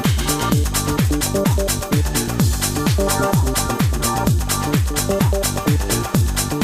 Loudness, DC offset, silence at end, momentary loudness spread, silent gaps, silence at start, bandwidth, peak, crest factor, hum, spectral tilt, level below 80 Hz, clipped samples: -18 LUFS; under 0.1%; 0 s; 2 LU; none; 0 s; 16 kHz; 0 dBFS; 18 dB; none; -4.5 dB/octave; -24 dBFS; under 0.1%